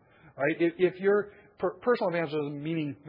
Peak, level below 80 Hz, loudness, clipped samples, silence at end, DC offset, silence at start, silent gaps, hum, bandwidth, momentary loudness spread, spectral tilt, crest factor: -12 dBFS; -72 dBFS; -29 LUFS; under 0.1%; 0 s; under 0.1%; 0.35 s; none; none; 5.4 kHz; 7 LU; -10 dB/octave; 16 dB